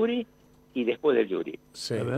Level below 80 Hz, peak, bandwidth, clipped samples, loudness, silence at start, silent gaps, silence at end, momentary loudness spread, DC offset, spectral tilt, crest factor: -68 dBFS; -12 dBFS; 13.5 kHz; under 0.1%; -29 LUFS; 0 s; none; 0 s; 13 LU; under 0.1%; -6 dB/octave; 16 dB